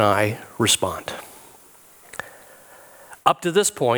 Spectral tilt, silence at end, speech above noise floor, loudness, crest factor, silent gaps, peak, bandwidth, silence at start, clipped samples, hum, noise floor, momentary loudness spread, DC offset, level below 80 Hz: -3 dB/octave; 0 s; 29 dB; -21 LUFS; 24 dB; none; 0 dBFS; over 20 kHz; 0 s; under 0.1%; none; -50 dBFS; 21 LU; under 0.1%; -58 dBFS